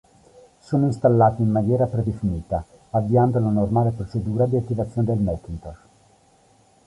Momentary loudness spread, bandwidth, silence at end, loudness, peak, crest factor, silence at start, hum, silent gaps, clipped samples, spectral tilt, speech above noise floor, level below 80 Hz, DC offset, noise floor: 11 LU; 10.5 kHz; 1.1 s; -22 LUFS; -4 dBFS; 18 dB; 0.7 s; none; none; under 0.1%; -10.5 dB/octave; 36 dB; -42 dBFS; under 0.1%; -57 dBFS